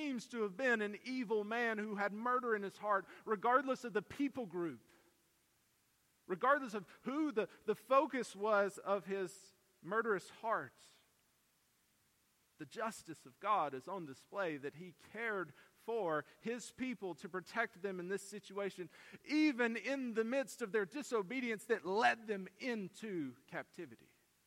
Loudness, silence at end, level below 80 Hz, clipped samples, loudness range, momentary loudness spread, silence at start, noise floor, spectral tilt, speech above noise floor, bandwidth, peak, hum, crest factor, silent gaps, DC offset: -39 LUFS; 0.5 s; -86 dBFS; under 0.1%; 7 LU; 14 LU; 0 s; -77 dBFS; -5 dB/octave; 37 dB; 16.5 kHz; -18 dBFS; none; 22 dB; none; under 0.1%